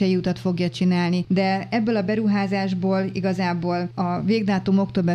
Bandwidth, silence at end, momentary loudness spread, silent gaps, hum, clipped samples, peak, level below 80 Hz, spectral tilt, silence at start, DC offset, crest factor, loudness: 8.4 kHz; 0 s; 4 LU; none; none; under 0.1%; -8 dBFS; -56 dBFS; -7.5 dB/octave; 0 s; under 0.1%; 12 dB; -22 LUFS